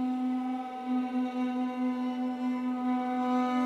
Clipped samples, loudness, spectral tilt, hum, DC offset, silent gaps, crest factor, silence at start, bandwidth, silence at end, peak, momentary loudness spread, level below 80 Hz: under 0.1%; -31 LUFS; -5.5 dB/octave; none; under 0.1%; none; 12 dB; 0 s; 6.6 kHz; 0 s; -20 dBFS; 4 LU; -78 dBFS